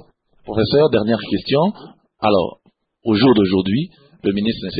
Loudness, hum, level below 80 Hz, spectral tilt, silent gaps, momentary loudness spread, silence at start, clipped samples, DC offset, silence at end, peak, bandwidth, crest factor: -18 LUFS; none; -48 dBFS; -12 dB/octave; none; 12 LU; 0.45 s; under 0.1%; under 0.1%; 0 s; -4 dBFS; 5 kHz; 14 dB